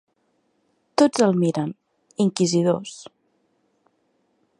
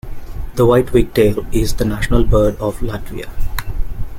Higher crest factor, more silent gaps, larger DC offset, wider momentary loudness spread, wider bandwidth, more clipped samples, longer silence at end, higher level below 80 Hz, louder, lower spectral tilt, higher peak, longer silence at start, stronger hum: first, 22 dB vs 14 dB; neither; neither; first, 19 LU vs 15 LU; second, 11.5 kHz vs 16.5 kHz; neither; first, 1.55 s vs 0 s; second, -70 dBFS vs -22 dBFS; second, -21 LUFS vs -17 LUFS; about the same, -5.5 dB/octave vs -6.5 dB/octave; about the same, -4 dBFS vs -2 dBFS; first, 1 s vs 0.05 s; neither